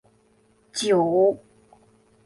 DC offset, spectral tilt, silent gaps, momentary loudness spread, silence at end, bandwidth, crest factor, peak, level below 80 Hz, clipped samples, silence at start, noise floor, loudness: under 0.1%; -4.5 dB/octave; none; 15 LU; 0.9 s; 11.5 kHz; 16 dB; -10 dBFS; -66 dBFS; under 0.1%; 0.75 s; -61 dBFS; -22 LUFS